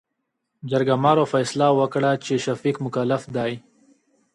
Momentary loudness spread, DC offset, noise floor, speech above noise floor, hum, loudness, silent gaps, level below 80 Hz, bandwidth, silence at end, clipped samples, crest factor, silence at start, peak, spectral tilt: 9 LU; under 0.1%; -78 dBFS; 57 dB; none; -22 LUFS; none; -66 dBFS; 11.5 kHz; 0.75 s; under 0.1%; 20 dB; 0.65 s; -4 dBFS; -6 dB/octave